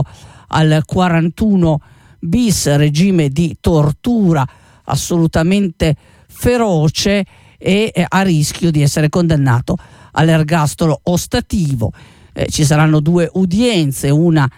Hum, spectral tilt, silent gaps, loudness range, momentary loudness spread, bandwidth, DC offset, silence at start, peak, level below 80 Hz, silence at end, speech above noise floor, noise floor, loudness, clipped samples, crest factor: none; -6 dB/octave; none; 2 LU; 9 LU; 16 kHz; under 0.1%; 0 s; -2 dBFS; -34 dBFS; 0.1 s; 22 dB; -35 dBFS; -14 LUFS; under 0.1%; 12 dB